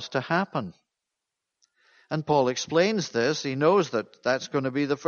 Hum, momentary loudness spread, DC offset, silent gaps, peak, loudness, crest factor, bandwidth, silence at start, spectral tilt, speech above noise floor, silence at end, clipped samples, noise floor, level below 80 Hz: none; 10 LU; under 0.1%; none; -8 dBFS; -26 LUFS; 18 dB; 7.2 kHz; 0 s; -5 dB/octave; 60 dB; 0 s; under 0.1%; -85 dBFS; -68 dBFS